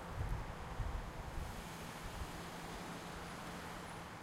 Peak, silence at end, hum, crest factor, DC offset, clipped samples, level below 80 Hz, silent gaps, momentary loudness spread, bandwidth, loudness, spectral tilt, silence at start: -28 dBFS; 0 s; none; 18 dB; under 0.1%; under 0.1%; -50 dBFS; none; 4 LU; 16 kHz; -47 LUFS; -5 dB/octave; 0 s